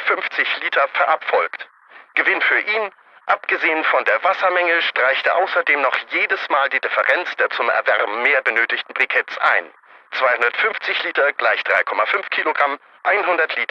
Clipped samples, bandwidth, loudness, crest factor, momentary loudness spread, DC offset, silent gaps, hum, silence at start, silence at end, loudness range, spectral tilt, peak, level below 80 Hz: under 0.1%; 7.8 kHz; -18 LUFS; 18 dB; 5 LU; under 0.1%; none; none; 0 s; 0.05 s; 2 LU; -2.5 dB/octave; -2 dBFS; -78 dBFS